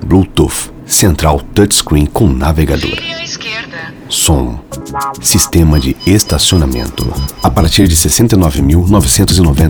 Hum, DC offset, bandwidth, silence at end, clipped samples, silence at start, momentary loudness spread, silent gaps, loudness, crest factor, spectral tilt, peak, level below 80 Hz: none; under 0.1%; over 20 kHz; 0 s; 0.5%; 0 s; 11 LU; none; -10 LUFS; 10 dB; -4.5 dB/octave; 0 dBFS; -18 dBFS